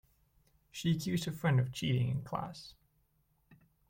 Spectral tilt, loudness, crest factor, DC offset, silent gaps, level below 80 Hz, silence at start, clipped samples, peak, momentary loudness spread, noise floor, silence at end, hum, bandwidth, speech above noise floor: -6 dB/octave; -34 LUFS; 18 dB; under 0.1%; none; -64 dBFS; 0.75 s; under 0.1%; -20 dBFS; 17 LU; -74 dBFS; 0.35 s; none; 16.5 kHz; 41 dB